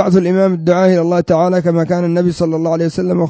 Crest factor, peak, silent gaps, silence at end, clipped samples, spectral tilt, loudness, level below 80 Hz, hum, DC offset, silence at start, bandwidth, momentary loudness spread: 12 dB; 0 dBFS; none; 0 s; under 0.1%; -8 dB/octave; -13 LUFS; -46 dBFS; none; under 0.1%; 0 s; 8 kHz; 4 LU